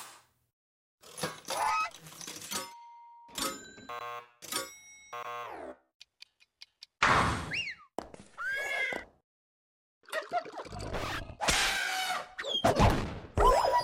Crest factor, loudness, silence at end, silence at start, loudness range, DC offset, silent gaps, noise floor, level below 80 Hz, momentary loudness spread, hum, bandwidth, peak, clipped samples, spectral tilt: 22 dB; -32 LUFS; 0 s; 0 s; 9 LU; under 0.1%; 0.53-0.98 s, 5.94-6.00 s, 9.24-10.01 s; -60 dBFS; -44 dBFS; 20 LU; none; 16.5 kHz; -12 dBFS; under 0.1%; -3.5 dB/octave